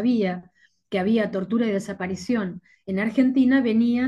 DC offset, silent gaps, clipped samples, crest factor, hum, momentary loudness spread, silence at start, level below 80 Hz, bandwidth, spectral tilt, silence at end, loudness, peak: under 0.1%; none; under 0.1%; 14 dB; none; 11 LU; 0 s; -64 dBFS; 9.6 kHz; -7 dB/octave; 0 s; -23 LUFS; -8 dBFS